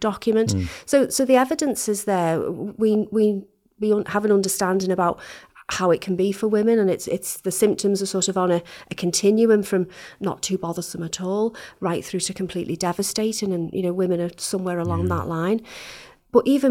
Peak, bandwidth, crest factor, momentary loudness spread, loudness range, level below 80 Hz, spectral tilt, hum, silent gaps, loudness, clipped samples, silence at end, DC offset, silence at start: -4 dBFS; 17 kHz; 18 dB; 10 LU; 4 LU; -56 dBFS; -5 dB/octave; none; none; -22 LUFS; under 0.1%; 0 s; under 0.1%; 0 s